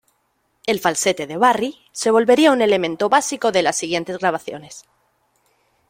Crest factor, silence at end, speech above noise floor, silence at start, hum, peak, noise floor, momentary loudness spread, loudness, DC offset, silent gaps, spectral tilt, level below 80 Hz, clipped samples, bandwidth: 18 dB; 1.1 s; 49 dB; 0.65 s; none; -2 dBFS; -67 dBFS; 12 LU; -18 LUFS; under 0.1%; none; -3 dB/octave; -64 dBFS; under 0.1%; 16.5 kHz